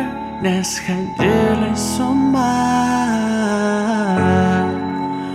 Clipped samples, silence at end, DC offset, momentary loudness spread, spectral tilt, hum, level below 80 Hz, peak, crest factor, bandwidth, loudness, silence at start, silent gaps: under 0.1%; 0 s; under 0.1%; 7 LU; -5.5 dB/octave; none; -42 dBFS; -2 dBFS; 14 dB; 15 kHz; -17 LUFS; 0 s; none